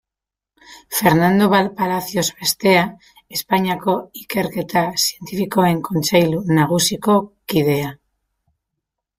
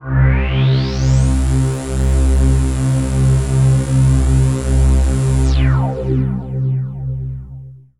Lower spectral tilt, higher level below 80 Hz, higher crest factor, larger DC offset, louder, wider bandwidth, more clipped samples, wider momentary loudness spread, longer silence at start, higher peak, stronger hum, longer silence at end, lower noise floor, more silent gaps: second, -4.5 dB/octave vs -7 dB/octave; second, -54 dBFS vs -18 dBFS; first, 18 dB vs 10 dB; second, under 0.1% vs 0.7%; second, -18 LUFS vs -15 LUFS; first, 16 kHz vs 11.5 kHz; neither; about the same, 9 LU vs 8 LU; first, 0.7 s vs 0 s; about the same, -2 dBFS vs -4 dBFS; neither; first, 1.25 s vs 0.2 s; first, -87 dBFS vs -34 dBFS; neither